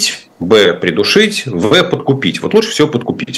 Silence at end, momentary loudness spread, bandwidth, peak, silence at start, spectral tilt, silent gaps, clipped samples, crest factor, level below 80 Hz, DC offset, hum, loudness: 0 s; 6 LU; 13.5 kHz; 0 dBFS; 0 s; -4 dB/octave; none; 0.2%; 12 dB; -50 dBFS; under 0.1%; none; -12 LUFS